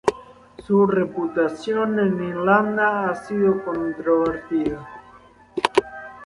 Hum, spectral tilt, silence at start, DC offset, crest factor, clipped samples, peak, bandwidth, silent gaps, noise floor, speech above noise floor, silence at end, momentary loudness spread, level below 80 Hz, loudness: none; -6.5 dB/octave; 0.05 s; under 0.1%; 20 dB; under 0.1%; -2 dBFS; 11.5 kHz; none; -49 dBFS; 28 dB; 0 s; 8 LU; -54 dBFS; -21 LUFS